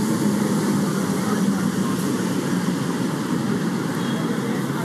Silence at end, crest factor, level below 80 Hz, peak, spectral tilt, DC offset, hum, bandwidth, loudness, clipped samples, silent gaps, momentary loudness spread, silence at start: 0 s; 12 dB; -60 dBFS; -10 dBFS; -5.5 dB/octave; under 0.1%; none; 15 kHz; -22 LUFS; under 0.1%; none; 3 LU; 0 s